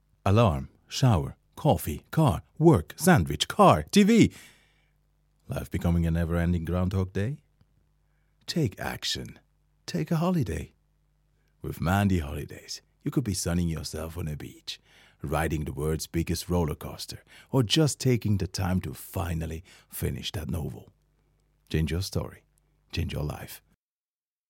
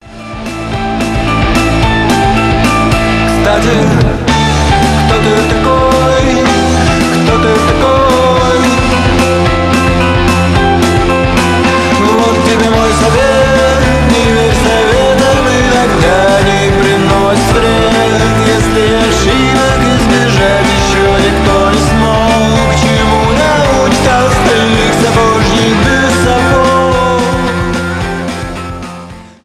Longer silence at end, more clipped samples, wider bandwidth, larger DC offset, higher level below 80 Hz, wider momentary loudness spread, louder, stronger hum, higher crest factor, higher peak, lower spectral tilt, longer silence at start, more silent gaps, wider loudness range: first, 0.9 s vs 0.2 s; neither; about the same, 17 kHz vs 15.5 kHz; neither; second, -44 dBFS vs -20 dBFS; first, 17 LU vs 3 LU; second, -27 LUFS vs -9 LUFS; neither; first, 22 dB vs 8 dB; second, -6 dBFS vs 0 dBFS; about the same, -6 dB/octave vs -5 dB/octave; first, 0.25 s vs 0.05 s; neither; first, 11 LU vs 1 LU